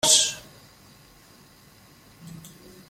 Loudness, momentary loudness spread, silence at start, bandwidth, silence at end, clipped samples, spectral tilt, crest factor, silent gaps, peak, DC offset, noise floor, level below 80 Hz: -19 LUFS; 29 LU; 0.05 s; 16.5 kHz; 0.4 s; under 0.1%; 0.5 dB/octave; 26 dB; none; -4 dBFS; under 0.1%; -53 dBFS; -62 dBFS